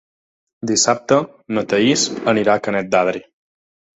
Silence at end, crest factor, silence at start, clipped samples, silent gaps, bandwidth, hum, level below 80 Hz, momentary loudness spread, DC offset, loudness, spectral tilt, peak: 0.75 s; 18 dB; 0.65 s; under 0.1%; none; 8.4 kHz; none; -58 dBFS; 9 LU; under 0.1%; -17 LUFS; -3.5 dB/octave; 0 dBFS